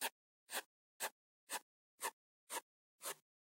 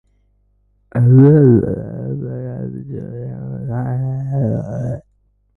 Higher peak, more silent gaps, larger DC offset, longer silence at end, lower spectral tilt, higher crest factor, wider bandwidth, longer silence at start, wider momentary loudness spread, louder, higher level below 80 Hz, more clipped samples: second, -28 dBFS vs 0 dBFS; first, 0.11-0.47 s, 0.65-1.00 s, 1.12-1.47 s, 1.62-1.98 s, 2.13-2.47 s, 2.62-2.99 s vs none; neither; second, 0.4 s vs 0.6 s; second, 1.5 dB/octave vs -12.5 dB/octave; first, 22 dB vs 16 dB; first, 16.5 kHz vs 2.2 kHz; second, 0 s vs 0.95 s; second, 2 LU vs 19 LU; second, -48 LUFS vs -16 LUFS; second, under -90 dBFS vs -44 dBFS; neither